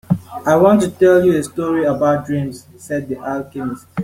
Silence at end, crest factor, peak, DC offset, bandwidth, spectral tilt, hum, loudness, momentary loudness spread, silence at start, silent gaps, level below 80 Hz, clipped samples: 0 s; 14 dB; -2 dBFS; under 0.1%; 16 kHz; -7 dB/octave; none; -16 LUFS; 14 LU; 0.1 s; none; -52 dBFS; under 0.1%